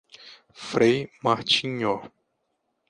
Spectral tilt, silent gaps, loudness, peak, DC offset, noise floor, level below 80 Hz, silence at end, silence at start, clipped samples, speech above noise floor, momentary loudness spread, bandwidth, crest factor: -4.5 dB/octave; none; -24 LUFS; -6 dBFS; under 0.1%; -76 dBFS; -64 dBFS; 0.8 s; 0.25 s; under 0.1%; 52 dB; 10 LU; 10.5 kHz; 20 dB